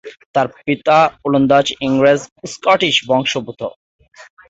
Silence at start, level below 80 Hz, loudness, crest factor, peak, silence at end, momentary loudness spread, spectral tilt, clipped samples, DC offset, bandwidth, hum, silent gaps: 0.05 s; -54 dBFS; -15 LUFS; 14 dB; -2 dBFS; 0.25 s; 12 LU; -4.5 dB/octave; under 0.1%; under 0.1%; 8 kHz; none; 0.26-0.34 s, 2.32-2.36 s, 3.76-3.99 s, 4.08-4.12 s